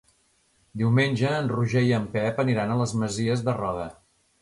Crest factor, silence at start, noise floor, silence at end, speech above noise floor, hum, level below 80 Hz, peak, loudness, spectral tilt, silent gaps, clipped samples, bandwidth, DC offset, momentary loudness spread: 18 dB; 0.75 s; -66 dBFS; 0.5 s; 42 dB; none; -56 dBFS; -8 dBFS; -25 LUFS; -6.5 dB/octave; none; under 0.1%; 11.5 kHz; under 0.1%; 8 LU